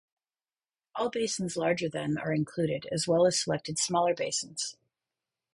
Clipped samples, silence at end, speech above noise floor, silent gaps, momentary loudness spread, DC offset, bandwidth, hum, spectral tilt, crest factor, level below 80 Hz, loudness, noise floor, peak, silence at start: under 0.1%; 0.8 s; over 61 dB; none; 9 LU; under 0.1%; 11.5 kHz; none; -4 dB/octave; 18 dB; -68 dBFS; -30 LUFS; under -90 dBFS; -12 dBFS; 0.95 s